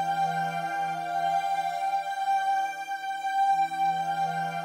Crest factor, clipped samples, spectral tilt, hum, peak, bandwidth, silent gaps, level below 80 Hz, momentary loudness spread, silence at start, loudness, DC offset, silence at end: 10 dB; under 0.1%; -3.5 dB/octave; none; -18 dBFS; 16 kHz; none; -86 dBFS; 5 LU; 0 s; -28 LUFS; under 0.1%; 0 s